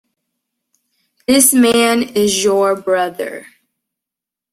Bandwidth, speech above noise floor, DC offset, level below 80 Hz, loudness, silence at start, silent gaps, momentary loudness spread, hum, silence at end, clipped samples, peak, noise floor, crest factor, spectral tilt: 16 kHz; 72 dB; under 0.1%; -56 dBFS; -13 LUFS; 1.3 s; none; 17 LU; none; 1.1 s; under 0.1%; 0 dBFS; -85 dBFS; 16 dB; -2.5 dB/octave